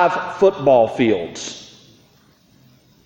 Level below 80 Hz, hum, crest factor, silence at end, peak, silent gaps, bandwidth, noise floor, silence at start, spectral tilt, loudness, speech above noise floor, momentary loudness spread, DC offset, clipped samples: -58 dBFS; none; 18 dB; 1.4 s; -2 dBFS; none; 16 kHz; -54 dBFS; 0 s; -5 dB/octave; -17 LUFS; 38 dB; 16 LU; under 0.1%; under 0.1%